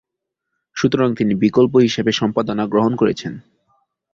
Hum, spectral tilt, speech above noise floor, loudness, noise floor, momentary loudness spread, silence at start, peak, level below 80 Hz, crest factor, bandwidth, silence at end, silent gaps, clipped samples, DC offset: none; -6 dB/octave; 64 dB; -17 LUFS; -80 dBFS; 13 LU; 0.75 s; -2 dBFS; -54 dBFS; 16 dB; 7.6 kHz; 0.75 s; none; under 0.1%; under 0.1%